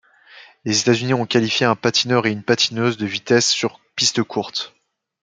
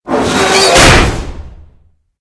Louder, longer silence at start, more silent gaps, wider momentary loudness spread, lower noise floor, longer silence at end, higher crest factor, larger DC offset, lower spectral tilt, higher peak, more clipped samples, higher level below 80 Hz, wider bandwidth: second, -18 LUFS vs -7 LUFS; first, 0.35 s vs 0.05 s; neither; second, 8 LU vs 17 LU; about the same, -46 dBFS vs -48 dBFS; about the same, 0.55 s vs 0.65 s; first, 18 dB vs 10 dB; neither; about the same, -3.5 dB/octave vs -3 dB/octave; about the same, -2 dBFS vs 0 dBFS; second, under 0.1% vs 2%; second, -64 dBFS vs -20 dBFS; second, 9.6 kHz vs 11 kHz